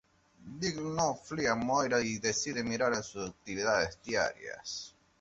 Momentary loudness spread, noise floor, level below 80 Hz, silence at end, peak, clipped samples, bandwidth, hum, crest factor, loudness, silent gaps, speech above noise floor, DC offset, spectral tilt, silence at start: 12 LU; -54 dBFS; -62 dBFS; 0.3 s; -14 dBFS; under 0.1%; 8 kHz; none; 20 dB; -33 LUFS; none; 21 dB; under 0.1%; -3 dB/octave; 0.4 s